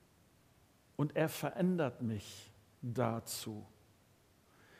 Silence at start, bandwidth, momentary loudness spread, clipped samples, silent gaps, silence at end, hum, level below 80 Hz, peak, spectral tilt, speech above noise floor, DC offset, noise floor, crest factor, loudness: 1 s; 15.5 kHz; 16 LU; under 0.1%; none; 1.1 s; none; -76 dBFS; -18 dBFS; -6 dB/octave; 31 dB; under 0.1%; -68 dBFS; 22 dB; -38 LUFS